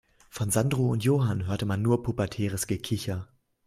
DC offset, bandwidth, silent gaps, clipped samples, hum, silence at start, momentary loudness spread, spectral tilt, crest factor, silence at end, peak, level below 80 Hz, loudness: under 0.1%; 16 kHz; none; under 0.1%; none; 0.35 s; 9 LU; -6 dB/octave; 16 dB; 0.4 s; -12 dBFS; -54 dBFS; -28 LUFS